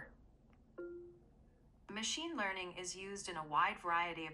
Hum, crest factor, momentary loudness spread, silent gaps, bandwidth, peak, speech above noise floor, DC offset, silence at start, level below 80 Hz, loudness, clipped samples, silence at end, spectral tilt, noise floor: none; 20 dB; 19 LU; none; 13 kHz; -22 dBFS; 26 dB; under 0.1%; 0 s; -68 dBFS; -40 LUFS; under 0.1%; 0 s; -2 dB/octave; -66 dBFS